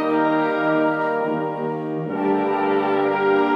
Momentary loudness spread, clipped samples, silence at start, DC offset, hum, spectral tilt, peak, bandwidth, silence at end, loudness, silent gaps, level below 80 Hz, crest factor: 7 LU; under 0.1%; 0 s; under 0.1%; none; -8 dB/octave; -8 dBFS; 6 kHz; 0 s; -21 LUFS; none; -72 dBFS; 12 dB